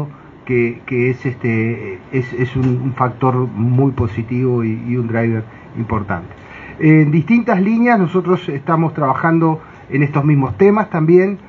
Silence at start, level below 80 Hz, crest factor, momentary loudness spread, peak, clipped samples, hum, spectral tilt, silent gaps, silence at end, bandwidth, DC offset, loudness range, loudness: 0 s; -46 dBFS; 16 dB; 11 LU; 0 dBFS; under 0.1%; none; -10 dB/octave; none; 0 s; 6.4 kHz; under 0.1%; 4 LU; -16 LUFS